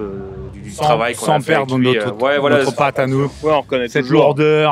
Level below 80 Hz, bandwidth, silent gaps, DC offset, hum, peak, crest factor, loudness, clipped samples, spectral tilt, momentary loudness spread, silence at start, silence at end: -46 dBFS; 14.5 kHz; none; under 0.1%; none; 0 dBFS; 14 dB; -15 LUFS; under 0.1%; -5.5 dB/octave; 12 LU; 0 s; 0 s